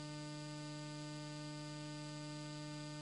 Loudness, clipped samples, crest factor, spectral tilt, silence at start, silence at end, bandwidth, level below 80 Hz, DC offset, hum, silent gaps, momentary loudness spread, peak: -48 LUFS; under 0.1%; 10 dB; -5 dB/octave; 0 s; 0 s; 11 kHz; -82 dBFS; under 0.1%; none; none; 0 LU; -38 dBFS